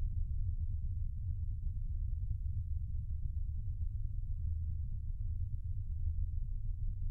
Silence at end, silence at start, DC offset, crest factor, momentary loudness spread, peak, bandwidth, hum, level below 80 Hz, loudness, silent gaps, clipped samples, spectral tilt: 0 s; 0 s; under 0.1%; 12 dB; 3 LU; -26 dBFS; 0.3 kHz; none; -38 dBFS; -42 LUFS; none; under 0.1%; -11.5 dB/octave